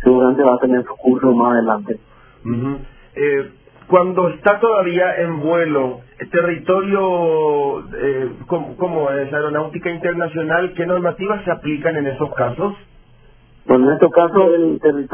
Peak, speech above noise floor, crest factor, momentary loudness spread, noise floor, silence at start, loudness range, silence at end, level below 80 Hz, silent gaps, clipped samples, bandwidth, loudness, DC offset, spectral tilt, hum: 0 dBFS; 31 dB; 16 dB; 11 LU; -47 dBFS; 0 s; 4 LU; 0 s; -48 dBFS; none; under 0.1%; 3.5 kHz; -17 LUFS; under 0.1%; -11 dB/octave; none